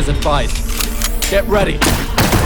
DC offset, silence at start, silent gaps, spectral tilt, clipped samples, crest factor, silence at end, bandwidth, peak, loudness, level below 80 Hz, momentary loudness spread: under 0.1%; 0 s; none; -4 dB/octave; under 0.1%; 12 dB; 0 s; over 20 kHz; -2 dBFS; -16 LUFS; -18 dBFS; 5 LU